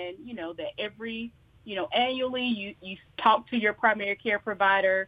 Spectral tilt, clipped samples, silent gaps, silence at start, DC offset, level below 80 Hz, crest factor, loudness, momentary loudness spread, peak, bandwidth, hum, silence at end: -6.5 dB/octave; under 0.1%; none; 0 s; under 0.1%; -66 dBFS; 22 dB; -27 LUFS; 14 LU; -6 dBFS; 5 kHz; none; 0 s